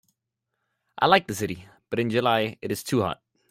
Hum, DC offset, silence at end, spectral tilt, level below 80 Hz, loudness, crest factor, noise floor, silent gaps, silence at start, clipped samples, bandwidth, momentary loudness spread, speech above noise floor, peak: none; under 0.1%; 0.35 s; -4.5 dB/octave; -62 dBFS; -25 LUFS; 22 dB; -82 dBFS; none; 0.95 s; under 0.1%; 16 kHz; 12 LU; 58 dB; -4 dBFS